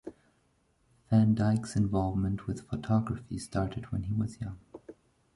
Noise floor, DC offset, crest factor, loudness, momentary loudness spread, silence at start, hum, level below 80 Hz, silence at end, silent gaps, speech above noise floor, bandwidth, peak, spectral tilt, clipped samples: -71 dBFS; under 0.1%; 18 dB; -31 LUFS; 16 LU; 0.05 s; none; -50 dBFS; 0.45 s; none; 41 dB; 11.5 kHz; -14 dBFS; -8 dB/octave; under 0.1%